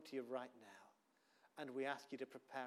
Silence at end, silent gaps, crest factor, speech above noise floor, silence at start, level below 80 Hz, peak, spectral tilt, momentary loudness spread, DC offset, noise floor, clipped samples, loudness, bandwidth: 0 s; none; 20 dB; 29 dB; 0 s; under -90 dBFS; -30 dBFS; -4.5 dB/octave; 17 LU; under 0.1%; -78 dBFS; under 0.1%; -49 LUFS; 15 kHz